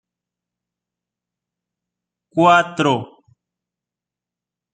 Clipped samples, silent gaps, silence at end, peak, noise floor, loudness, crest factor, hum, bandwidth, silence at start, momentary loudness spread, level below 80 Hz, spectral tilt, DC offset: under 0.1%; none; 1.7 s; -2 dBFS; -87 dBFS; -16 LUFS; 22 dB; none; 9.2 kHz; 2.35 s; 11 LU; -68 dBFS; -5.5 dB/octave; under 0.1%